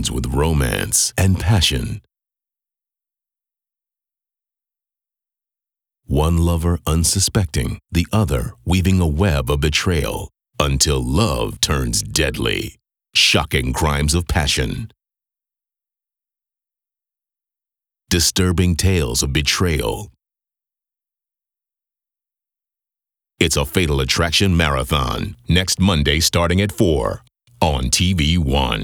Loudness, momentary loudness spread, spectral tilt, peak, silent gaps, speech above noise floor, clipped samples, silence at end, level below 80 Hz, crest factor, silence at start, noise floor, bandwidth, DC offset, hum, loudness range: -18 LUFS; 8 LU; -4 dB/octave; 0 dBFS; none; 70 dB; under 0.1%; 0 s; -30 dBFS; 20 dB; 0 s; -87 dBFS; over 20 kHz; under 0.1%; none; 8 LU